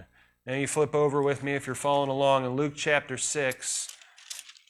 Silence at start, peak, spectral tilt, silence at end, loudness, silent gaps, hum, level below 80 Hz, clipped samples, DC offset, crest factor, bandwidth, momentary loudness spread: 0 s; -10 dBFS; -3.5 dB/octave; 0.2 s; -27 LUFS; none; none; -66 dBFS; under 0.1%; under 0.1%; 20 dB; 14.5 kHz; 14 LU